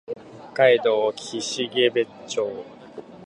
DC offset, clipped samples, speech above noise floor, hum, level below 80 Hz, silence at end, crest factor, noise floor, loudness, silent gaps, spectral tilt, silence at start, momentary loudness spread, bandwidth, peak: under 0.1%; under 0.1%; 20 dB; none; -70 dBFS; 0 s; 20 dB; -41 dBFS; -22 LUFS; none; -3 dB/octave; 0.1 s; 20 LU; 11 kHz; -4 dBFS